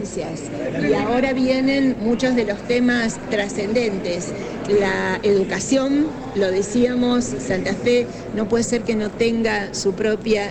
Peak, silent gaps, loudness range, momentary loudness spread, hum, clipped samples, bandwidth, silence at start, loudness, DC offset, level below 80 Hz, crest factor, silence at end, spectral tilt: -6 dBFS; none; 1 LU; 7 LU; none; under 0.1%; 9.6 kHz; 0 s; -20 LUFS; under 0.1%; -46 dBFS; 14 dB; 0 s; -5 dB/octave